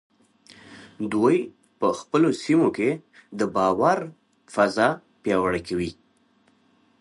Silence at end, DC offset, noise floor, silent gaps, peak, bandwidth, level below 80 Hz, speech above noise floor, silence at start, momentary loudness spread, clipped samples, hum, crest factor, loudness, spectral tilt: 1.1 s; under 0.1%; -63 dBFS; none; -6 dBFS; 11.5 kHz; -58 dBFS; 40 dB; 0.7 s; 13 LU; under 0.1%; none; 18 dB; -23 LUFS; -6 dB/octave